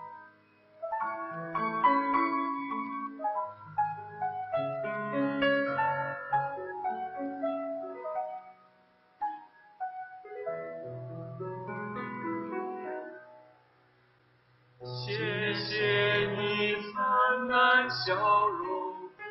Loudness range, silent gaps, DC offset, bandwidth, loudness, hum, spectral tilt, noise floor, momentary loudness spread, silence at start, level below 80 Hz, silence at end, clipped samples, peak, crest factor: 13 LU; none; under 0.1%; 6 kHz; -31 LUFS; none; -2.5 dB/octave; -65 dBFS; 16 LU; 0 s; -72 dBFS; 0 s; under 0.1%; -12 dBFS; 20 dB